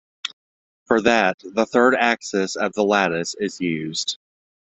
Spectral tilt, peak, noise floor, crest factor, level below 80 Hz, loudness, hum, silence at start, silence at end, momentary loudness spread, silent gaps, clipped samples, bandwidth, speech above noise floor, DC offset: -3.5 dB/octave; -2 dBFS; under -90 dBFS; 20 dB; -60 dBFS; -20 LUFS; none; 0.25 s; 0.65 s; 12 LU; 0.33-0.86 s, 1.34-1.38 s; under 0.1%; 8.2 kHz; over 70 dB; under 0.1%